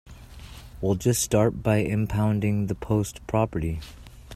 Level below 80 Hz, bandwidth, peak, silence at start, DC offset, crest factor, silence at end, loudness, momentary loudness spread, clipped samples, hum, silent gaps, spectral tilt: -42 dBFS; 15 kHz; -8 dBFS; 0.05 s; under 0.1%; 18 dB; 0 s; -25 LUFS; 21 LU; under 0.1%; none; none; -6 dB/octave